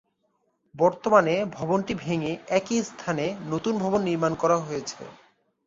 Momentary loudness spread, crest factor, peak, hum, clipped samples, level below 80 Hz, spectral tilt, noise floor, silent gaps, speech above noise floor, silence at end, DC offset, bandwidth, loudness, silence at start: 11 LU; 22 dB; -4 dBFS; none; under 0.1%; -62 dBFS; -5.5 dB/octave; -72 dBFS; none; 47 dB; 0.55 s; under 0.1%; 7.8 kHz; -25 LUFS; 0.75 s